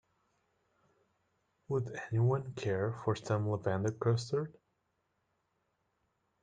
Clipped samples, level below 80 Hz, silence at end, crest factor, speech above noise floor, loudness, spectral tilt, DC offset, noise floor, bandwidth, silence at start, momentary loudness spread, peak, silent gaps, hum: under 0.1%; -72 dBFS; 1.9 s; 18 dB; 47 dB; -35 LUFS; -7 dB/octave; under 0.1%; -80 dBFS; 9.2 kHz; 1.7 s; 5 LU; -20 dBFS; none; none